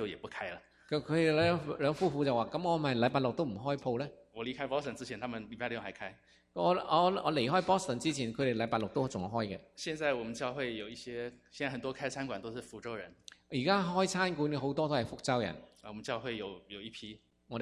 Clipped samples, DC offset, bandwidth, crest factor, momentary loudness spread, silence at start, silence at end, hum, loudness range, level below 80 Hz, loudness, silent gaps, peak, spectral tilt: under 0.1%; under 0.1%; 12.5 kHz; 20 dB; 15 LU; 0 s; 0 s; none; 6 LU; -64 dBFS; -34 LUFS; none; -14 dBFS; -5.5 dB/octave